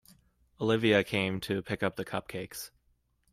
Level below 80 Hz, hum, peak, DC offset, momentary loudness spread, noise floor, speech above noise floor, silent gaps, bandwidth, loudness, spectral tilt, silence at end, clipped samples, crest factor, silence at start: -62 dBFS; none; -12 dBFS; under 0.1%; 15 LU; -72 dBFS; 42 dB; none; 16 kHz; -31 LUFS; -5.5 dB/octave; 0.65 s; under 0.1%; 20 dB; 0.6 s